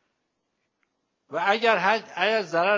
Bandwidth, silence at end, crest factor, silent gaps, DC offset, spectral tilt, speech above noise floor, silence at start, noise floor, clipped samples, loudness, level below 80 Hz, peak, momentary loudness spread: 7.6 kHz; 0 s; 20 dB; none; under 0.1%; -4 dB/octave; 54 dB; 1.3 s; -77 dBFS; under 0.1%; -23 LUFS; -84 dBFS; -6 dBFS; 6 LU